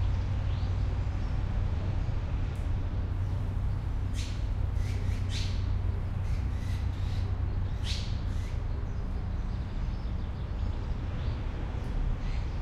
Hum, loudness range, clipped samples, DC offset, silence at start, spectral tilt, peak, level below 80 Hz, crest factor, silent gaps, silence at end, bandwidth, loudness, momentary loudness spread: none; 3 LU; under 0.1%; under 0.1%; 0 s; -6.5 dB/octave; -18 dBFS; -32 dBFS; 12 dB; none; 0 s; 10 kHz; -34 LUFS; 4 LU